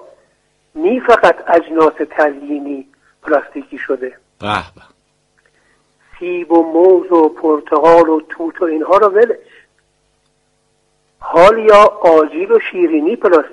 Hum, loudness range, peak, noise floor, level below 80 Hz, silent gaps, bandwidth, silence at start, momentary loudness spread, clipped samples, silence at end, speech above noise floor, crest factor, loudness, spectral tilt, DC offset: none; 10 LU; 0 dBFS; -61 dBFS; -48 dBFS; none; 10.5 kHz; 0.75 s; 16 LU; 0.1%; 0.05 s; 49 dB; 14 dB; -12 LUFS; -5.5 dB/octave; under 0.1%